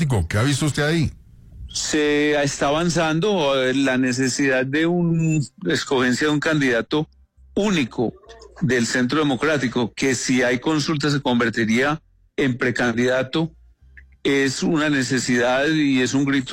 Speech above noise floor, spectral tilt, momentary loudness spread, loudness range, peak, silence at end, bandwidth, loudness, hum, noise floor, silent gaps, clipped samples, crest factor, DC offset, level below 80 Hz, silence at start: 29 dB; -5 dB/octave; 6 LU; 2 LU; -10 dBFS; 0 s; 16 kHz; -20 LUFS; none; -48 dBFS; none; under 0.1%; 10 dB; under 0.1%; -46 dBFS; 0 s